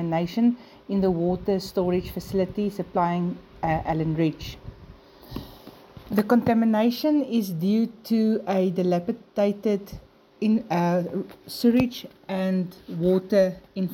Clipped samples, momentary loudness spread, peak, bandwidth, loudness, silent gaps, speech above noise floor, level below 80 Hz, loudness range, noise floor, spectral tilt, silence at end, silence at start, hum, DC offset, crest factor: under 0.1%; 15 LU; -6 dBFS; 17 kHz; -25 LUFS; none; 24 dB; -50 dBFS; 4 LU; -48 dBFS; -7.5 dB/octave; 0 s; 0 s; none; under 0.1%; 18 dB